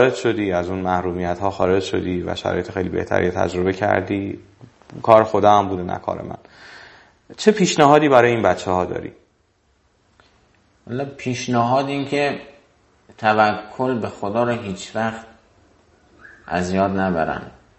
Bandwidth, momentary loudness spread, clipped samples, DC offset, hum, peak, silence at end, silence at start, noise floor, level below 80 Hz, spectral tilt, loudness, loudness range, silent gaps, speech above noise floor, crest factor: 8.6 kHz; 15 LU; under 0.1%; under 0.1%; none; 0 dBFS; 0.3 s; 0 s; -62 dBFS; -46 dBFS; -5.5 dB/octave; -19 LUFS; 7 LU; none; 43 dB; 20 dB